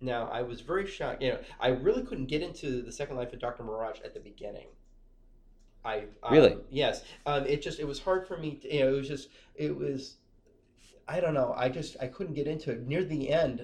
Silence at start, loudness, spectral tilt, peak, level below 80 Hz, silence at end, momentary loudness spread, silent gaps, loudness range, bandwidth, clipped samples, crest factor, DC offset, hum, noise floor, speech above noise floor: 0 s; -31 LUFS; -6 dB/octave; -6 dBFS; -50 dBFS; 0 s; 12 LU; none; 9 LU; 10.5 kHz; under 0.1%; 24 dB; under 0.1%; none; -63 dBFS; 32 dB